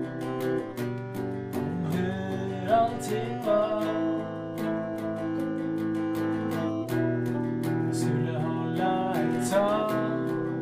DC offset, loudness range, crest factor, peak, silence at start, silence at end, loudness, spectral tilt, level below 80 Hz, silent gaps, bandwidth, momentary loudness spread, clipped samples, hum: under 0.1%; 2 LU; 16 dB; -12 dBFS; 0 s; 0 s; -29 LUFS; -7 dB/octave; -62 dBFS; none; 15.5 kHz; 7 LU; under 0.1%; none